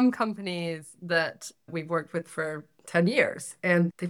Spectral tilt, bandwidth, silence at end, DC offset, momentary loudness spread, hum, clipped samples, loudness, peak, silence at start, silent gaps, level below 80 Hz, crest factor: -5.5 dB/octave; 13.5 kHz; 0 s; under 0.1%; 12 LU; none; under 0.1%; -28 LUFS; -8 dBFS; 0 s; none; -76 dBFS; 20 dB